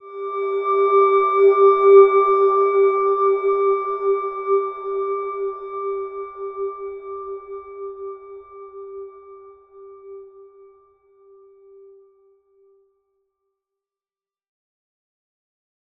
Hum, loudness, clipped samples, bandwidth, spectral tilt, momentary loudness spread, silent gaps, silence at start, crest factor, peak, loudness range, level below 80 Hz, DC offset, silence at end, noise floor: none; -18 LUFS; under 0.1%; 3.8 kHz; -6.5 dB/octave; 24 LU; none; 0.05 s; 20 dB; -2 dBFS; 23 LU; -68 dBFS; under 0.1%; 5.7 s; under -90 dBFS